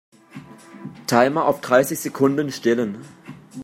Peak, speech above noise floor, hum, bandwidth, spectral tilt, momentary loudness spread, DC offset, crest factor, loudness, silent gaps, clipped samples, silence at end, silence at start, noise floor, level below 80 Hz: -2 dBFS; 23 dB; none; 16.5 kHz; -5 dB/octave; 22 LU; under 0.1%; 20 dB; -20 LUFS; none; under 0.1%; 0 s; 0.35 s; -42 dBFS; -66 dBFS